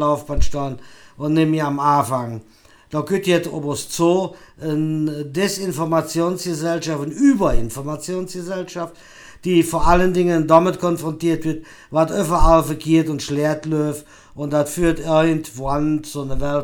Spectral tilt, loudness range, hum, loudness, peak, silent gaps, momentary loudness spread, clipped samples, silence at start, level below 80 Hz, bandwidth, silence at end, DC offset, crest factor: -6 dB/octave; 4 LU; none; -20 LUFS; 0 dBFS; none; 12 LU; under 0.1%; 0 s; -30 dBFS; 19 kHz; 0 s; under 0.1%; 18 dB